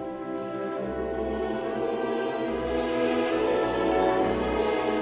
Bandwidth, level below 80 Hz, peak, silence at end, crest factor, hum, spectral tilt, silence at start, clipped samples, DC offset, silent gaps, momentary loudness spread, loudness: 4 kHz; -46 dBFS; -10 dBFS; 0 s; 16 dB; none; -10 dB/octave; 0 s; under 0.1%; under 0.1%; none; 7 LU; -27 LUFS